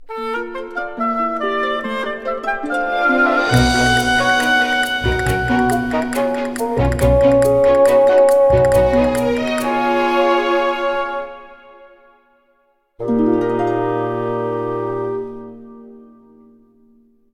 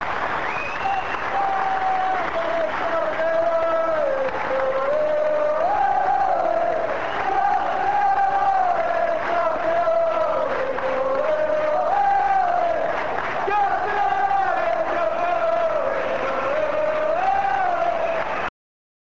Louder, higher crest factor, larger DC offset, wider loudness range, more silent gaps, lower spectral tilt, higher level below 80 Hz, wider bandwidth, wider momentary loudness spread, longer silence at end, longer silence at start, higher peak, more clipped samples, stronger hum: first, -16 LUFS vs -22 LUFS; about the same, 14 dB vs 12 dB; second, under 0.1% vs 2%; first, 8 LU vs 1 LU; neither; about the same, -5.5 dB/octave vs -5 dB/octave; first, -32 dBFS vs -52 dBFS; first, 16 kHz vs 7.8 kHz; first, 11 LU vs 4 LU; first, 1.35 s vs 0.7 s; about the same, 0 s vs 0 s; first, -2 dBFS vs -10 dBFS; neither; neither